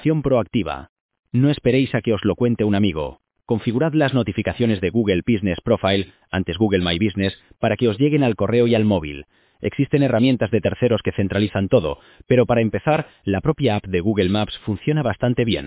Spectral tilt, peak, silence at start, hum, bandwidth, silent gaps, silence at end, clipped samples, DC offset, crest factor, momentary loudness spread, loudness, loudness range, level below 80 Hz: -11.5 dB/octave; -4 dBFS; 0 s; none; 4 kHz; 0.89-1.09 s, 1.19-1.23 s; 0 s; under 0.1%; under 0.1%; 16 dB; 8 LU; -20 LUFS; 1 LU; -42 dBFS